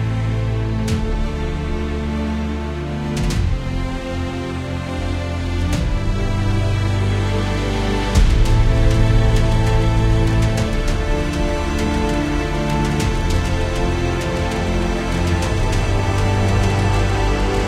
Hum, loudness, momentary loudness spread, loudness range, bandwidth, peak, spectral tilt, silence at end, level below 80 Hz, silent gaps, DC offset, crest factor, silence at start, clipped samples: none; -20 LUFS; 7 LU; 6 LU; 13.5 kHz; -2 dBFS; -6 dB/octave; 0 s; -22 dBFS; none; under 0.1%; 16 dB; 0 s; under 0.1%